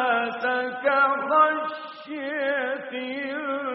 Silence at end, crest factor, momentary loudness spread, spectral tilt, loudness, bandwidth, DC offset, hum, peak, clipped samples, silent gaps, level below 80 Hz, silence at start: 0 s; 18 dB; 12 LU; 0 dB/octave; -24 LUFS; 5.6 kHz; under 0.1%; none; -8 dBFS; under 0.1%; none; -78 dBFS; 0 s